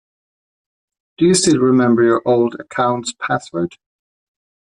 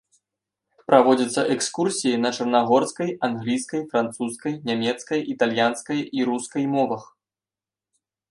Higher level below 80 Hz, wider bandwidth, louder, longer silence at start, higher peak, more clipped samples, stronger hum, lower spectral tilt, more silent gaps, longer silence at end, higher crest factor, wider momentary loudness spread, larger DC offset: first, -58 dBFS vs -70 dBFS; about the same, 11 kHz vs 11.5 kHz; first, -16 LUFS vs -23 LUFS; first, 1.2 s vs 0.9 s; about the same, -2 dBFS vs 0 dBFS; neither; neither; about the same, -4.5 dB/octave vs -4.5 dB/octave; neither; second, 1.1 s vs 1.25 s; second, 16 dB vs 22 dB; about the same, 10 LU vs 8 LU; neither